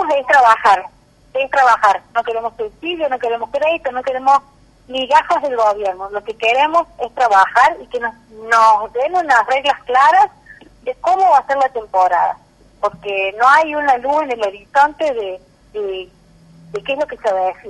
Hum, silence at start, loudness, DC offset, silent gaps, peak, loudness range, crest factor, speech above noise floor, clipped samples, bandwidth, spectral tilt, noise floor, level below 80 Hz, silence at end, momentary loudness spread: 50 Hz at -60 dBFS; 0 s; -15 LUFS; under 0.1%; none; -2 dBFS; 4 LU; 14 dB; 30 dB; under 0.1%; 11.5 kHz; -2.5 dB/octave; -45 dBFS; -52 dBFS; 0 s; 14 LU